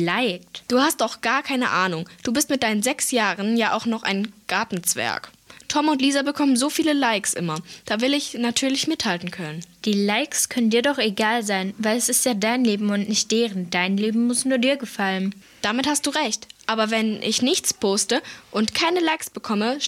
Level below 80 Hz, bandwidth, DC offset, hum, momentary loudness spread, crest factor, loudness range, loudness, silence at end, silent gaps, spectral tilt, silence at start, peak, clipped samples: -64 dBFS; 16.5 kHz; under 0.1%; none; 7 LU; 14 dB; 2 LU; -22 LUFS; 0 s; none; -3 dB/octave; 0 s; -8 dBFS; under 0.1%